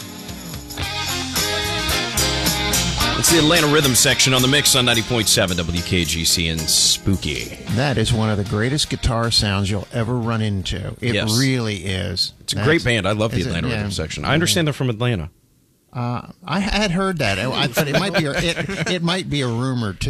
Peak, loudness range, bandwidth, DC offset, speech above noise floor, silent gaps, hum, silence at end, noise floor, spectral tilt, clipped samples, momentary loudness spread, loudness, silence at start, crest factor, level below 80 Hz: -4 dBFS; 7 LU; 16 kHz; under 0.1%; 39 dB; none; none; 0 s; -58 dBFS; -3.5 dB/octave; under 0.1%; 11 LU; -18 LUFS; 0 s; 16 dB; -36 dBFS